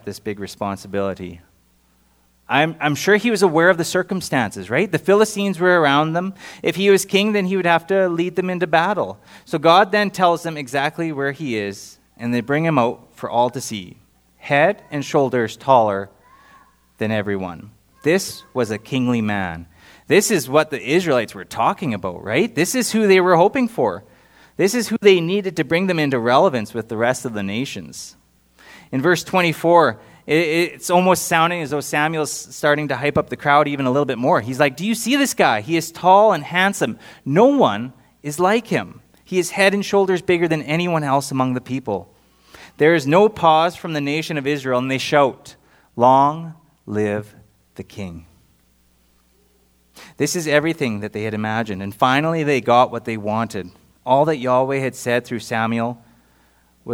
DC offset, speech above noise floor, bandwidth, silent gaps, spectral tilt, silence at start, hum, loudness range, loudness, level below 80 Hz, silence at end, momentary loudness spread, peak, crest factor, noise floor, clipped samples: under 0.1%; 40 dB; over 20 kHz; none; -5 dB/octave; 0.05 s; none; 5 LU; -18 LUFS; -60 dBFS; 0 s; 13 LU; 0 dBFS; 18 dB; -58 dBFS; under 0.1%